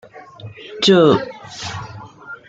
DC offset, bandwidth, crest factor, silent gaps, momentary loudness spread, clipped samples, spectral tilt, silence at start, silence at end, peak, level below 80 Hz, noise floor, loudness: under 0.1%; 9 kHz; 18 dB; none; 25 LU; under 0.1%; -5 dB/octave; 0.15 s; 0.15 s; -2 dBFS; -54 dBFS; -37 dBFS; -15 LUFS